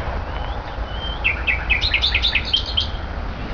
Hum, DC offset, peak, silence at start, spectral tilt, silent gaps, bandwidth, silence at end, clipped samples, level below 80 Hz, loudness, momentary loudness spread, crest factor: none; 0.5%; -4 dBFS; 0 s; -4 dB/octave; none; 5.4 kHz; 0 s; under 0.1%; -28 dBFS; -20 LUFS; 13 LU; 18 dB